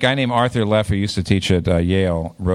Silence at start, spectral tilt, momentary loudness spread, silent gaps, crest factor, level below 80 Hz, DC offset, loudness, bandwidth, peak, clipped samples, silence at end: 0 s; -6 dB/octave; 4 LU; none; 16 dB; -36 dBFS; under 0.1%; -18 LUFS; 12.5 kHz; -2 dBFS; under 0.1%; 0 s